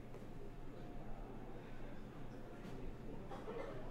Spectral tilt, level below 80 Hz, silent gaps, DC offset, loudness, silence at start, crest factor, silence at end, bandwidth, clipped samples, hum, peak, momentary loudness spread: -7 dB/octave; -52 dBFS; none; under 0.1%; -53 LUFS; 0 s; 14 dB; 0 s; 10.5 kHz; under 0.1%; none; -34 dBFS; 6 LU